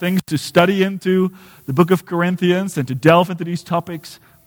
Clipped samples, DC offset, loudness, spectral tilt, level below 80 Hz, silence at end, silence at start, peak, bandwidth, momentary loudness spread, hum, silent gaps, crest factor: under 0.1%; under 0.1%; -17 LUFS; -6.5 dB/octave; -58 dBFS; 0.3 s; 0 s; 0 dBFS; over 20 kHz; 10 LU; none; none; 16 dB